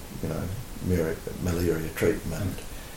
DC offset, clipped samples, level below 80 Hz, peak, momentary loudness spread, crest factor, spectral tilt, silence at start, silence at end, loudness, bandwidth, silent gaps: under 0.1%; under 0.1%; -40 dBFS; -10 dBFS; 7 LU; 18 dB; -6 dB/octave; 0 s; 0 s; -29 LUFS; 17 kHz; none